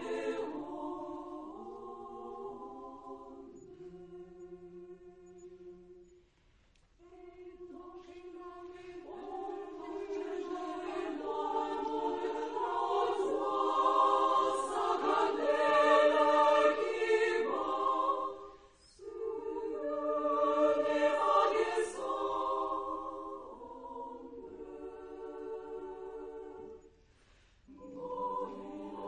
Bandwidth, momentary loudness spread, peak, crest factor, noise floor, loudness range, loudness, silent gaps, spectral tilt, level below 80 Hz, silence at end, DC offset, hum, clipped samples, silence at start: 10 kHz; 23 LU; -14 dBFS; 20 dB; -67 dBFS; 23 LU; -32 LUFS; none; -3.5 dB/octave; -70 dBFS; 0 s; under 0.1%; none; under 0.1%; 0 s